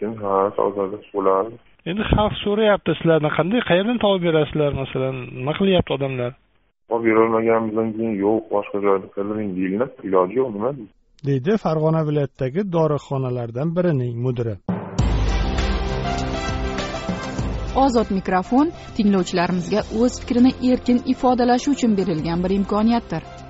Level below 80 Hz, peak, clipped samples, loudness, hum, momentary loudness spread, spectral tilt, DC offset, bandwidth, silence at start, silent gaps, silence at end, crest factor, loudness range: -34 dBFS; -2 dBFS; under 0.1%; -21 LUFS; none; 8 LU; -6 dB/octave; under 0.1%; 8 kHz; 0 s; none; 0 s; 18 dB; 4 LU